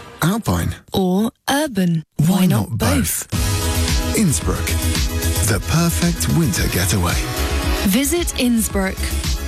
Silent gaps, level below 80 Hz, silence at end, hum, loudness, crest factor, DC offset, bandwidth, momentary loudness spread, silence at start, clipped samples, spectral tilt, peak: none; -26 dBFS; 0 s; none; -18 LUFS; 14 dB; under 0.1%; 16 kHz; 4 LU; 0 s; under 0.1%; -4.5 dB/octave; -4 dBFS